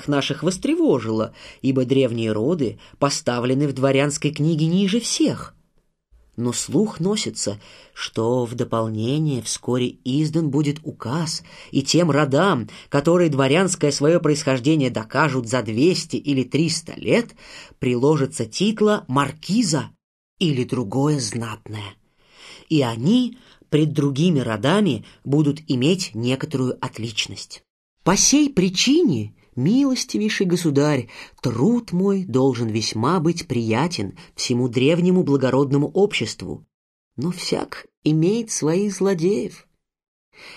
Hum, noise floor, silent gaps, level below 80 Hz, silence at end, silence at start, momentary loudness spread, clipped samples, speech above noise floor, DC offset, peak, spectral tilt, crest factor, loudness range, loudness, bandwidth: none; -64 dBFS; 20.04-20.37 s, 27.70-27.97 s, 36.74-37.11 s, 37.97-38.02 s, 40.08-40.32 s; -54 dBFS; 0 s; 0 s; 10 LU; under 0.1%; 44 dB; under 0.1%; -4 dBFS; -5 dB/octave; 16 dB; 4 LU; -21 LUFS; 13 kHz